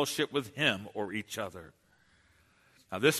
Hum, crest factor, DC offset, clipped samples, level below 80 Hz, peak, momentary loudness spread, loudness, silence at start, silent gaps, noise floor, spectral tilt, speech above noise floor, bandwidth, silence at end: none; 22 dB; under 0.1%; under 0.1%; -70 dBFS; -12 dBFS; 13 LU; -33 LUFS; 0 s; none; -66 dBFS; -3.5 dB/octave; 34 dB; 13.5 kHz; 0 s